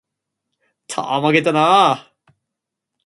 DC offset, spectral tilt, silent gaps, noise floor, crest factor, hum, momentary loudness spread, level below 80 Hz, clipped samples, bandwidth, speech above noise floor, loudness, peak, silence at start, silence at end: under 0.1%; -4.5 dB/octave; none; -81 dBFS; 18 dB; none; 14 LU; -68 dBFS; under 0.1%; 11.5 kHz; 66 dB; -16 LUFS; 0 dBFS; 0.9 s; 1.05 s